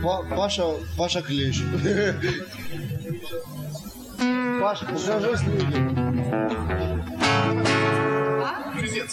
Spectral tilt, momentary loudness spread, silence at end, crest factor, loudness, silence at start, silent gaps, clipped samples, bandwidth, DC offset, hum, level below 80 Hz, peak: -5.5 dB/octave; 12 LU; 0 s; 16 dB; -25 LUFS; 0 s; none; under 0.1%; 16 kHz; under 0.1%; none; -42 dBFS; -8 dBFS